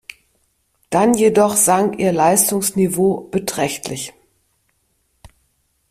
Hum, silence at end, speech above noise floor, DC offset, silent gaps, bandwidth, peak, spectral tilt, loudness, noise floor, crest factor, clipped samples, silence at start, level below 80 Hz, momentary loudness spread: none; 1.8 s; 49 dB; under 0.1%; none; 16 kHz; 0 dBFS; -4 dB/octave; -16 LUFS; -65 dBFS; 18 dB; under 0.1%; 0.9 s; -54 dBFS; 11 LU